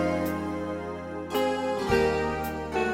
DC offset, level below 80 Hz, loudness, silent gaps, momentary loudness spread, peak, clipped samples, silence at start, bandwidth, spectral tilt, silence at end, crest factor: under 0.1%; -46 dBFS; -28 LUFS; none; 10 LU; -10 dBFS; under 0.1%; 0 s; 17 kHz; -5.5 dB/octave; 0 s; 16 dB